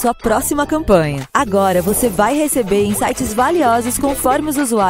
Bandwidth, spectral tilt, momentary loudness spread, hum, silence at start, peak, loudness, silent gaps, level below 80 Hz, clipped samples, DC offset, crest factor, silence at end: 16.5 kHz; -4.5 dB/octave; 4 LU; none; 0 s; 0 dBFS; -15 LUFS; none; -34 dBFS; under 0.1%; under 0.1%; 14 dB; 0 s